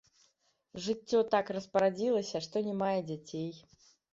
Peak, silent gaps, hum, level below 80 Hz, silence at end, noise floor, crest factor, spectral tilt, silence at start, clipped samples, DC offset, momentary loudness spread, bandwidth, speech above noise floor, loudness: -14 dBFS; none; none; -74 dBFS; 0.55 s; -74 dBFS; 20 dB; -5.5 dB/octave; 0.75 s; under 0.1%; under 0.1%; 11 LU; 7.8 kHz; 41 dB; -33 LUFS